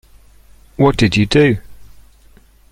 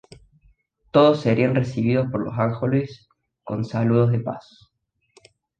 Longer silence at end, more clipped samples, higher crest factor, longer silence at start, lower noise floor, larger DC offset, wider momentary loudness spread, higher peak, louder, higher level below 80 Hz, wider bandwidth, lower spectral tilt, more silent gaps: second, 0.9 s vs 1.2 s; neither; about the same, 16 dB vs 20 dB; second, 0.8 s vs 0.95 s; second, -47 dBFS vs -72 dBFS; neither; second, 11 LU vs 14 LU; about the same, -2 dBFS vs -2 dBFS; first, -14 LUFS vs -21 LUFS; first, -36 dBFS vs -54 dBFS; first, 15 kHz vs 8.6 kHz; second, -6.5 dB/octave vs -8.5 dB/octave; neither